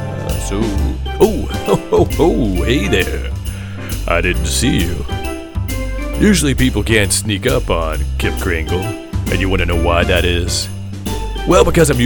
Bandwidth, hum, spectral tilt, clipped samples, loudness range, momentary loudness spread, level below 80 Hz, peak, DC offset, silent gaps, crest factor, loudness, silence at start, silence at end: 19.5 kHz; none; -5 dB/octave; under 0.1%; 2 LU; 11 LU; -22 dBFS; 0 dBFS; under 0.1%; none; 16 dB; -16 LUFS; 0 s; 0 s